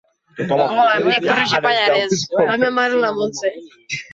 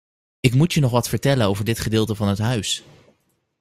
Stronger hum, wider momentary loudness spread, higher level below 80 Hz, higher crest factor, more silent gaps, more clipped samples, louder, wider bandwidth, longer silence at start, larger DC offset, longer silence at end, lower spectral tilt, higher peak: neither; first, 10 LU vs 5 LU; second, -60 dBFS vs -46 dBFS; second, 14 dB vs 20 dB; neither; neither; first, -17 LUFS vs -20 LUFS; second, 8 kHz vs 16 kHz; about the same, 0.35 s vs 0.45 s; neither; second, 0.1 s vs 0.8 s; second, -3.5 dB/octave vs -5.5 dB/octave; about the same, -4 dBFS vs -2 dBFS